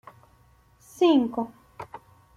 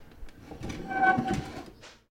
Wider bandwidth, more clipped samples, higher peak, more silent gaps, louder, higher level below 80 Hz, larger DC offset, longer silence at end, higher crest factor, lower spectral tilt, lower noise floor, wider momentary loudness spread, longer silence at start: second, 13.5 kHz vs 16 kHz; neither; about the same, -10 dBFS vs -12 dBFS; neither; first, -24 LUFS vs -28 LUFS; second, -64 dBFS vs -50 dBFS; neither; first, 0.4 s vs 0.15 s; about the same, 18 dB vs 20 dB; about the same, -5.5 dB/octave vs -5.5 dB/octave; first, -59 dBFS vs -49 dBFS; about the same, 23 LU vs 23 LU; first, 1 s vs 0 s